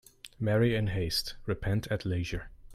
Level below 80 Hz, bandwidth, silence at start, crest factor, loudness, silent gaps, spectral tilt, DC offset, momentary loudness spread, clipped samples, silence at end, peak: -46 dBFS; 15 kHz; 0.25 s; 16 dB; -31 LUFS; none; -6 dB/octave; under 0.1%; 10 LU; under 0.1%; 0 s; -16 dBFS